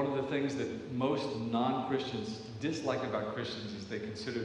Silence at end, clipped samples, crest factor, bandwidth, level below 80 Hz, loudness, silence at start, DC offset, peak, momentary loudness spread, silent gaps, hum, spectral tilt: 0 s; under 0.1%; 16 dB; 10.5 kHz; -68 dBFS; -35 LUFS; 0 s; under 0.1%; -18 dBFS; 8 LU; none; none; -6 dB/octave